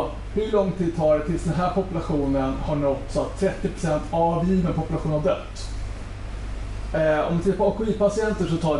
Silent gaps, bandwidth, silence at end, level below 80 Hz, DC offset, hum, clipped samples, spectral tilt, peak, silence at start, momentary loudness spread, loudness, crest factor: none; 11.5 kHz; 0 s; -34 dBFS; under 0.1%; none; under 0.1%; -7 dB/octave; -8 dBFS; 0 s; 12 LU; -24 LUFS; 16 dB